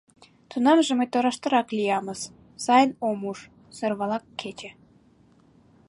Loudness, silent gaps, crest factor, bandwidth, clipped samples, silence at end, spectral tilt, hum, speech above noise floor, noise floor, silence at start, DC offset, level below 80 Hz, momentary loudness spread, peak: -24 LUFS; none; 20 dB; 11.5 kHz; under 0.1%; 1.15 s; -4 dB/octave; none; 34 dB; -58 dBFS; 0.5 s; under 0.1%; -68 dBFS; 18 LU; -6 dBFS